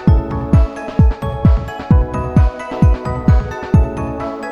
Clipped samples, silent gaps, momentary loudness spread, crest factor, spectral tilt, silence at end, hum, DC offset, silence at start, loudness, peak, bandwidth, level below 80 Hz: under 0.1%; none; 5 LU; 14 dB; -9 dB/octave; 0 s; none; 0.2%; 0 s; -16 LUFS; 0 dBFS; 7 kHz; -18 dBFS